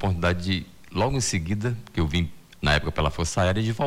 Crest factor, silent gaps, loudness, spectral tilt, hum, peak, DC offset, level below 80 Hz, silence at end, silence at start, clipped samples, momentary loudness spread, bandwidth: 16 dB; none; -26 LUFS; -5 dB/octave; none; -10 dBFS; under 0.1%; -38 dBFS; 0 s; 0 s; under 0.1%; 6 LU; 15.5 kHz